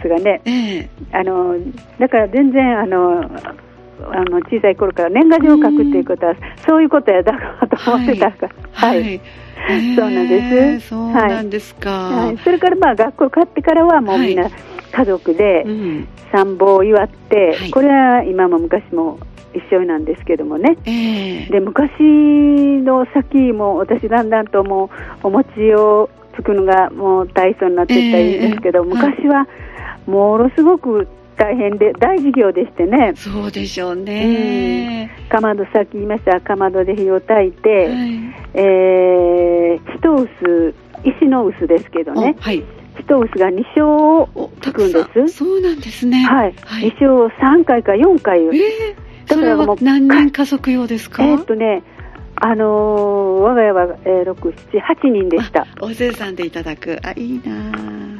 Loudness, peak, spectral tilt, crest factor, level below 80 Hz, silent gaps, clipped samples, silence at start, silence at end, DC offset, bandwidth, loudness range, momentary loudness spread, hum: -14 LUFS; 0 dBFS; -7 dB/octave; 14 dB; -40 dBFS; none; under 0.1%; 0 s; 0 s; under 0.1%; 12.5 kHz; 3 LU; 12 LU; none